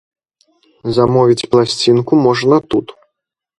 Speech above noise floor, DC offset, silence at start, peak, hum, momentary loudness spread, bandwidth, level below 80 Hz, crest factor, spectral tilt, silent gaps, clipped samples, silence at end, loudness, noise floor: 64 dB; under 0.1%; 0.85 s; 0 dBFS; none; 8 LU; 11.5 kHz; -48 dBFS; 14 dB; -6 dB/octave; none; under 0.1%; 0.7 s; -13 LUFS; -76 dBFS